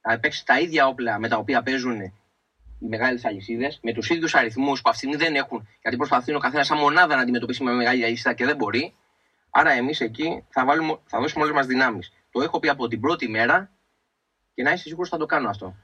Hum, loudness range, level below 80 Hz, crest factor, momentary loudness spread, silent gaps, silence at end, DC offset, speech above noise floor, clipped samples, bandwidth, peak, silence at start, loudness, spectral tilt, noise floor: none; 4 LU; -60 dBFS; 20 dB; 10 LU; none; 0.1 s; under 0.1%; 52 dB; under 0.1%; 9.8 kHz; -2 dBFS; 0.05 s; -22 LUFS; -4.5 dB/octave; -74 dBFS